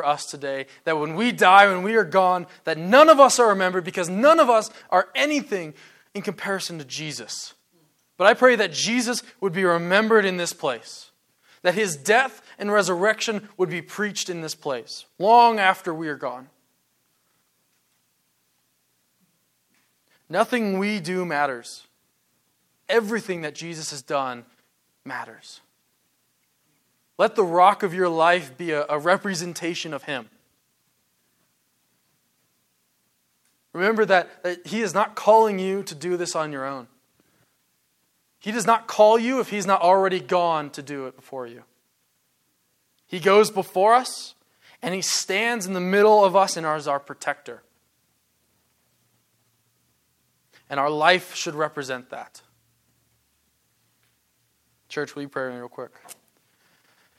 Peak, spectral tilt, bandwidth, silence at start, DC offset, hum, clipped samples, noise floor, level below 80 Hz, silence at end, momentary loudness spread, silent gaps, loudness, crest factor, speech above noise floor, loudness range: 0 dBFS; -3.5 dB/octave; 15.5 kHz; 0 s; under 0.1%; none; under 0.1%; -69 dBFS; -78 dBFS; 1.05 s; 18 LU; none; -21 LUFS; 22 dB; 48 dB; 17 LU